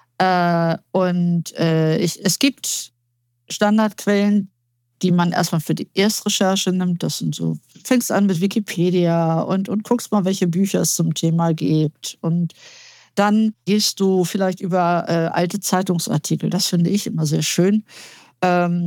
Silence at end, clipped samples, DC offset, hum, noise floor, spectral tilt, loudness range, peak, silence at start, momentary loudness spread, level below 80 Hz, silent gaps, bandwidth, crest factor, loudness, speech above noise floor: 0 s; under 0.1%; under 0.1%; none; -69 dBFS; -5 dB/octave; 1 LU; -4 dBFS; 0.2 s; 6 LU; -70 dBFS; none; 18.5 kHz; 16 dB; -19 LUFS; 50 dB